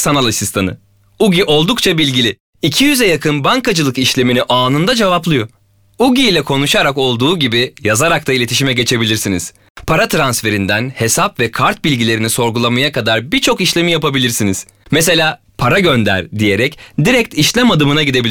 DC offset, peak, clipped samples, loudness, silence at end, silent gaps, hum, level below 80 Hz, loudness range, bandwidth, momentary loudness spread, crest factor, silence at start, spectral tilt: under 0.1%; -2 dBFS; under 0.1%; -12 LUFS; 0 s; 2.40-2.53 s, 9.70-9.75 s; none; -40 dBFS; 2 LU; over 20 kHz; 6 LU; 12 dB; 0 s; -4 dB/octave